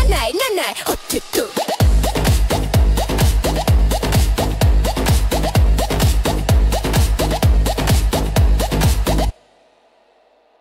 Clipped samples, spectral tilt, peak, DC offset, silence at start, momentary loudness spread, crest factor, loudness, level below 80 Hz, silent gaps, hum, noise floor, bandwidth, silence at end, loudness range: under 0.1%; -5 dB/octave; -4 dBFS; under 0.1%; 0 s; 3 LU; 12 dB; -17 LUFS; -18 dBFS; none; none; -55 dBFS; 16.5 kHz; 1.3 s; 1 LU